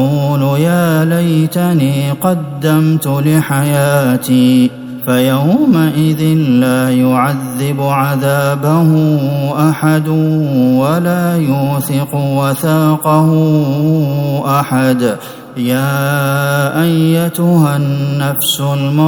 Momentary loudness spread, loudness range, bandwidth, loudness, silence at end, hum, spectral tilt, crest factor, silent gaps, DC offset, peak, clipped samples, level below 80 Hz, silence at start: 5 LU; 2 LU; over 20 kHz; -12 LUFS; 0 s; none; -6.5 dB/octave; 12 dB; none; under 0.1%; 0 dBFS; under 0.1%; -52 dBFS; 0 s